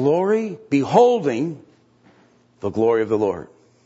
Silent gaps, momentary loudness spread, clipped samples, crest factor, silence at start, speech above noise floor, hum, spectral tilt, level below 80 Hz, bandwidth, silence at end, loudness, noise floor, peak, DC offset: none; 14 LU; under 0.1%; 18 dB; 0 s; 37 dB; none; -7 dB/octave; -62 dBFS; 8 kHz; 0.45 s; -20 LUFS; -56 dBFS; -2 dBFS; under 0.1%